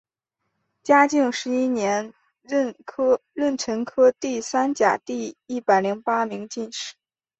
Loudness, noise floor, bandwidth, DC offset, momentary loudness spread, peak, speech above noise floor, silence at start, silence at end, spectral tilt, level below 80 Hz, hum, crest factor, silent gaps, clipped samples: -22 LUFS; -79 dBFS; 8.2 kHz; under 0.1%; 12 LU; -4 dBFS; 57 dB; 0.85 s; 0.5 s; -4 dB/octave; -68 dBFS; none; 20 dB; none; under 0.1%